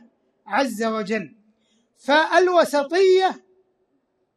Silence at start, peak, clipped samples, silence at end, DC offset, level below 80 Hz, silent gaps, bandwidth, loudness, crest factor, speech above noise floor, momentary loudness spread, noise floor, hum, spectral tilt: 0.45 s; -4 dBFS; under 0.1%; 1 s; under 0.1%; -78 dBFS; none; 13 kHz; -20 LUFS; 18 dB; 51 dB; 13 LU; -70 dBFS; none; -4 dB/octave